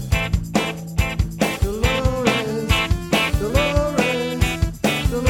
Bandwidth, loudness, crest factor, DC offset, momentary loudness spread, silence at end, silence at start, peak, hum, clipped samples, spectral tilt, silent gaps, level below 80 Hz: 19 kHz; -20 LUFS; 16 dB; under 0.1%; 4 LU; 0 s; 0 s; -2 dBFS; none; under 0.1%; -5 dB/octave; none; -26 dBFS